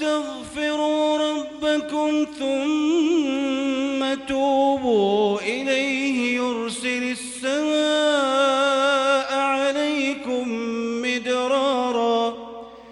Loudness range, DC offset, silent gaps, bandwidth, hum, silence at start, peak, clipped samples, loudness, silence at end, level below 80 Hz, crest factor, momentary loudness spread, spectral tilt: 2 LU; under 0.1%; none; 12 kHz; none; 0 s; -8 dBFS; under 0.1%; -22 LUFS; 0 s; -60 dBFS; 12 dB; 7 LU; -3 dB/octave